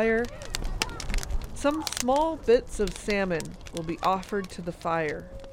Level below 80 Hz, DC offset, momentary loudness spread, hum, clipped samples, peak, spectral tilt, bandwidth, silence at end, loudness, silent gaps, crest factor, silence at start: -38 dBFS; under 0.1%; 11 LU; none; under 0.1%; -8 dBFS; -4 dB/octave; 17 kHz; 0 s; -29 LUFS; none; 20 dB; 0 s